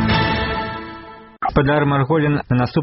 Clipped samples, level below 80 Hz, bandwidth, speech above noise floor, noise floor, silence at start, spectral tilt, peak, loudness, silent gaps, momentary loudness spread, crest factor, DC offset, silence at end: under 0.1%; -34 dBFS; 5.8 kHz; 21 dB; -38 dBFS; 0 s; -5 dB/octave; -2 dBFS; -18 LUFS; none; 13 LU; 16 dB; under 0.1%; 0 s